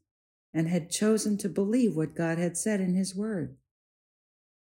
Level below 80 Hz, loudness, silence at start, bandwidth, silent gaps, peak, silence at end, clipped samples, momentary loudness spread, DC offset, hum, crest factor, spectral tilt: -68 dBFS; -29 LUFS; 0.55 s; 16 kHz; none; -14 dBFS; 1.1 s; under 0.1%; 7 LU; under 0.1%; none; 14 dB; -5.5 dB/octave